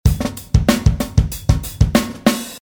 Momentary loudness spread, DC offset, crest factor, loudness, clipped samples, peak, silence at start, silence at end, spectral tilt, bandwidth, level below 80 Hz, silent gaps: 4 LU; under 0.1%; 16 dB; -18 LUFS; under 0.1%; 0 dBFS; 0.05 s; 0.15 s; -6 dB/octave; over 20 kHz; -22 dBFS; none